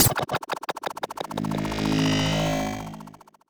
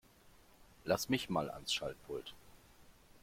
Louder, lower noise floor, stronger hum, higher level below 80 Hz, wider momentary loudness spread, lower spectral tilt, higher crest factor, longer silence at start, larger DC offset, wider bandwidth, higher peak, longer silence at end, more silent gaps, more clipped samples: first, -26 LUFS vs -38 LUFS; second, -46 dBFS vs -64 dBFS; neither; first, -44 dBFS vs -66 dBFS; about the same, 13 LU vs 13 LU; about the same, -4 dB/octave vs -4 dB/octave; about the same, 22 dB vs 24 dB; second, 0 s vs 0.6 s; neither; first, over 20 kHz vs 16.5 kHz; first, -4 dBFS vs -18 dBFS; first, 0.4 s vs 0.05 s; neither; neither